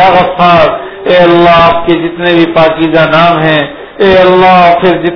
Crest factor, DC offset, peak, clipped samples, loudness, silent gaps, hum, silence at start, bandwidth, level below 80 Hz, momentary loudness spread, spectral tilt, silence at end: 6 dB; under 0.1%; 0 dBFS; 7%; -6 LUFS; none; none; 0 s; 5.4 kHz; -34 dBFS; 7 LU; -7.5 dB/octave; 0 s